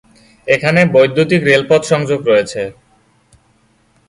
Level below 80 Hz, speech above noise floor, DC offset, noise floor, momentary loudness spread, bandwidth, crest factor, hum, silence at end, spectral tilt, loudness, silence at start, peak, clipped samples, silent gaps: -52 dBFS; 43 dB; under 0.1%; -55 dBFS; 12 LU; 11.5 kHz; 14 dB; none; 1.4 s; -5.5 dB/octave; -12 LUFS; 0.45 s; 0 dBFS; under 0.1%; none